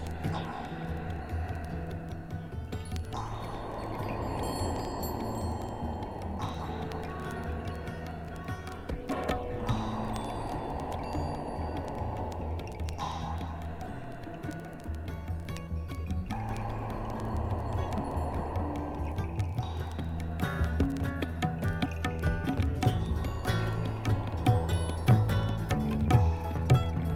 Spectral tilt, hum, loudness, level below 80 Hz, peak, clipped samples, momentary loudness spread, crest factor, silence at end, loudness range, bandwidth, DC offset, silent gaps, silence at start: -7 dB/octave; none; -33 LUFS; -40 dBFS; -12 dBFS; under 0.1%; 11 LU; 20 dB; 0 s; 8 LU; 16 kHz; under 0.1%; none; 0 s